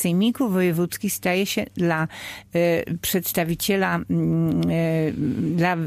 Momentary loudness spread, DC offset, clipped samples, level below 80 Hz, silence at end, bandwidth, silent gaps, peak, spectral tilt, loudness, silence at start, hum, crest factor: 4 LU; under 0.1%; under 0.1%; -52 dBFS; 0 s; 15.5 kHz; none; -8 dBFS; -5.5 dB/octave; -23 LUFS; 0 s; none; 14 dB